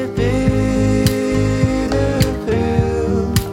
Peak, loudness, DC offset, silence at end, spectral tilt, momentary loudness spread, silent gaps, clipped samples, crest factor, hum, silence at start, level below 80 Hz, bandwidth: 0 dBFS; -17 LUFS; under 0.1%; 0 s; -6.5 dB/octave; 2 LU; none; under 0.1%; 16 dB; none; 0 s; -26 dBFS; 17.5 kHz